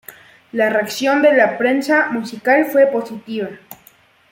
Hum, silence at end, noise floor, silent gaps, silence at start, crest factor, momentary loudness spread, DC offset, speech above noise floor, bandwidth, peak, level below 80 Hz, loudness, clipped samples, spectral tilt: none; 0.6 s; -51 dBFS; none; 0.1 s; 16 dB; 13 LU; under 0.1%; 35 dB; 16.5 kHz; -2 dBFS; -68 dBFS; -16 LUFS; under 0.1%; -4.5 dB/octave